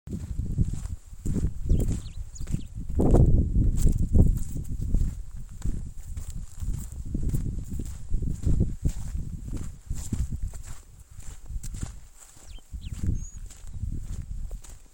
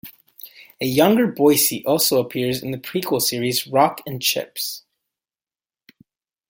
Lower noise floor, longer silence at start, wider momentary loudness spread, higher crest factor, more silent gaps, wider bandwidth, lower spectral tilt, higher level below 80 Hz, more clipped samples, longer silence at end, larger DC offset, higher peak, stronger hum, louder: second, -46 dBFS vs under -90 dBFS; about the same, 0.05 s vs 0.05 s; first, 20 LU vs 12 LU; about the same, 20 dB vs 20 dB; neither; about the same, 17 kHz vs 17 kHz; first, -8 dB/octave vs -3.5 dB/octave; first, -30 dBFS vs -62 dBFS; neither; second, 0.1 s vs 1.7 s; neither; second, -6 dBFS vs -2 dBFS; neither; second, -30 LUFS vs -19 LUFS